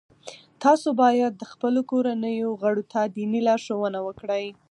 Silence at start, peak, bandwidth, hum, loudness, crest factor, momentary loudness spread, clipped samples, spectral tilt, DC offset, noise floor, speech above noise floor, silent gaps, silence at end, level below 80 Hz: 0.25 s; -6 dBFS; 10.5 kHz; none; -24 LUFS; 18 dB; 9 LU; under 0.1%; -5.5 dB/octave; under 0.1%; -45 dBFS; 22 dB; none; 0.2 s; -70 dBFS